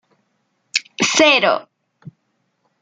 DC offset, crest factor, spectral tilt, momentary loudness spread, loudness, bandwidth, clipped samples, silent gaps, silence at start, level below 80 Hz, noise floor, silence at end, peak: under 0.1%; 20 dB; -1.5 dB/octave; 11 LU; -15 LUFS; 9.6 kHz; under 0.1%; none; 0.75 s; -68 dBFS; -69 dBFS; 0.7 s; 0 dBFS